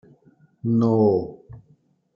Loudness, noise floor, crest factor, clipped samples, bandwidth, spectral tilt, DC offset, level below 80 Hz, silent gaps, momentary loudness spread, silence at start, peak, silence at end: -21 LUFS; -60 dBFS; 16 dB; under 0.1%; 5.8 kHz; -11.5 dB/octave; under 0.1%; -60 dBFS; none; 14 LU; 0.65 s; -8 dBFS; 0.55 s